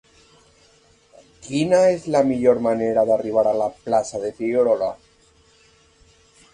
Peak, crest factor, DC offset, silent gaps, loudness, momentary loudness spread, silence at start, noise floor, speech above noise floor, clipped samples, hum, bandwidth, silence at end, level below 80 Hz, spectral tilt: -4 dBFS; 18 dB; under 0.1%; none; -20 LUFS; 10 LU; 1.45 s; -56 dBFS; 37 dB; under 0.1%; none; 10.5 kHz; 1.6 s; -58 dBFS; -6 dB/octave